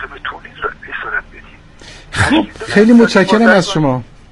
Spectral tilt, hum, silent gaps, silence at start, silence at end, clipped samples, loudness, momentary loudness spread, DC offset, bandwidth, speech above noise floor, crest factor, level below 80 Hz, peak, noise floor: -5.5 dB/octave; none; none; 0 s; 0.25 s; under 0.1%; -12 LUFS; 16 LU; under 0.1%; 11.5 kHz; 28 dB; 14 dB; -38 dBFS; 0 dBFS; -38 dBFS